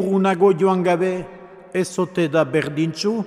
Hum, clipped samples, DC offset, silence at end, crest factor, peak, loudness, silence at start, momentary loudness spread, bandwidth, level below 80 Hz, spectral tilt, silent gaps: none; under 0.1%; under 0.1%; 0 s; 14 dB; -4 dBFS; -20 LUFS; 0 s; 9 LU; 12.5 kHz; -58 dBFS; -6 dB/octave; none